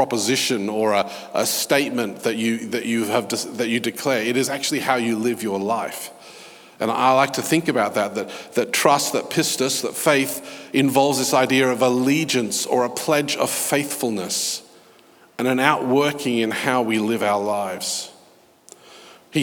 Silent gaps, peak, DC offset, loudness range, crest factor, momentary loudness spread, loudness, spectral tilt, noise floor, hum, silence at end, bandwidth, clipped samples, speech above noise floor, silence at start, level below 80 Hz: none; 0 dBFS; under 0.1%; 3 LU; 22 dB; 8 LU; -21 LUFS; -3.5 dB/octave; -53 dBFS; none; 0 s; over 20 kHz; under 0.1%; 32 dB; 0 s; -76 dBFS